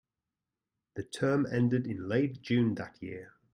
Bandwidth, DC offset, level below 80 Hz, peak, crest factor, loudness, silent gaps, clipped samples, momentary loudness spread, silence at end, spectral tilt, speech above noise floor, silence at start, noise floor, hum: 11 kHz; under 0.1%; -68 dBFS; -16 dBFS; 18 dB; -31 LUFS; none; under 0.1%; 15 LU; 0.25 s; -7.5 dB/octave; 58 dB; 0.95 s; -89 dBFS; none